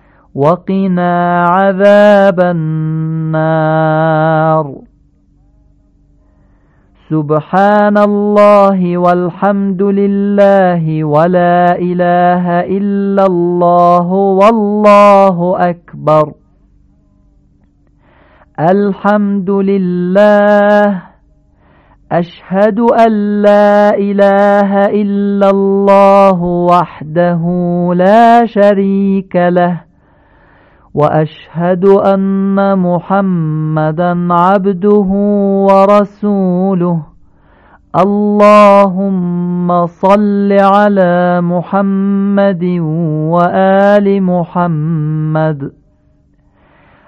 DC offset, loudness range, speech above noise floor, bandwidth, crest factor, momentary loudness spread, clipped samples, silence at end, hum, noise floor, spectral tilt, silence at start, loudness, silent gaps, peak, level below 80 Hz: under 0.1%; 5 LU; 41 dB; 7.8 kHz; 10 dB; 8 LU; 0.6%; 1.4 s; none; -50 dBFS; -9 dB/octave; 0.35 s; -10 LUFS; none; 0 dBFS; -48 dBFS